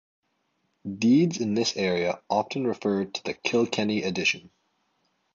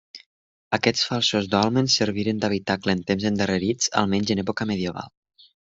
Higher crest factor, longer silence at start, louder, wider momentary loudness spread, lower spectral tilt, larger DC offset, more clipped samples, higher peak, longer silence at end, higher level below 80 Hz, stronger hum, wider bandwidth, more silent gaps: about the same, 20 dB vs 22 dB; first, 0.85 s vs 0.15 s; second, -26 LUFS vs -23 LUFS; about the same, 8 LU vs 6 LU; about the same, -5 dB/octave vs -4 dB/octave; neither; neither; second, -8 dBFS vs -2 dBFS; first, 0.95 s vs 0.65 s; about the same, -64 dBFS vs -60 dBFS; neither; about the same, 7.8 kHz vs 8.2 kHz; second, none vs 0.26-0.71 s